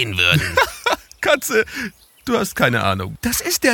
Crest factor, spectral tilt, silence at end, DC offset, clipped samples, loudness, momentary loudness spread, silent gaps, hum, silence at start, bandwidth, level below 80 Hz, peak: 18 dB; -3.5 dB/octave; 0 s; under 0.1%; under 0.1%; -18 LUFS; 9 LU; none; none; 0 s; 19 kHz; -42 dBFS; 0 dBFS